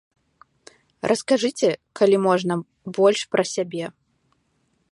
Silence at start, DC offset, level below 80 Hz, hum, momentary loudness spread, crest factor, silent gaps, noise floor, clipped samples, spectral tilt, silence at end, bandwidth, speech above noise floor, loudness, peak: 1.05 s; under 0.1%; -70 dBFS; none; 12 LU; 18 dB; none; -68 dBFS; under 0.1%; -4.5 dB/octave; 1 s; 11.5 kHz; 47 dB; -22 LUFS; -4 dBFS